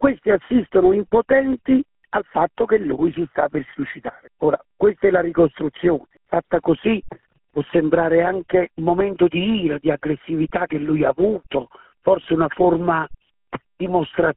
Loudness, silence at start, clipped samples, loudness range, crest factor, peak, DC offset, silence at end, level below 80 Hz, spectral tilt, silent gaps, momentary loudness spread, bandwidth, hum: -20 LUFS; 0 s; under 0.1%; 2 LU; 18 dB; -2 dBFS; under 0.1%; 0 s; -48 dBFS; -5.5 dB/octave; none; 10 LU; 4 kHz; none